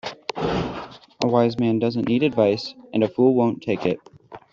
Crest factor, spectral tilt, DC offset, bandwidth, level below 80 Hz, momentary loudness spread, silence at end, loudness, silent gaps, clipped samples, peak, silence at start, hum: 18 dB; -7 dB/octave; under 0.1%; 7.4 kHz; -52 dBFS; 12 LU; 0.15 s; -22 LUFS; none; under 0.1%; -4 dBFS; 0.05 s; none